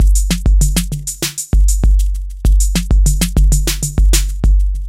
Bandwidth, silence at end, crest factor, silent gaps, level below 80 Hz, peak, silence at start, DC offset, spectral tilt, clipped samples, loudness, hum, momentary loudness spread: 16 kHz; 0 s; 12 dB; none; -12 dBFS; 0 dBFS; 0 s; under 0.1%; -4 dB/octave; under 0.1%; -15 LUFS; none; 6 LU